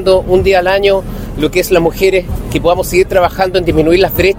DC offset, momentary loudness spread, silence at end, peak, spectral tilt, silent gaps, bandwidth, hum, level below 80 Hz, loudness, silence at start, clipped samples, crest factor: under 0.1%; 6 LU; 0 s; 0 dBFS; -5.5 dB/octave; none; 16.5 kHz; none; -24 dBFS; -11 LUFS; 0 s; 0.3%; 10 dB